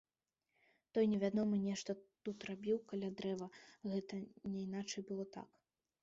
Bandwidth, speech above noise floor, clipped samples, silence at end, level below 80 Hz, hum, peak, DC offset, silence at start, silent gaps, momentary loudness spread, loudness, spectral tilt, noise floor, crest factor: 7.6 kHz; over 49 dB; under 0.1%; 0.55 s; -80 dBFS; none; -24 dBFS; under 0.1%; 0.95 s; none; 13 LU; -42 LUFS; -6.5 dB/octave; under -90 dBFS; 18 dB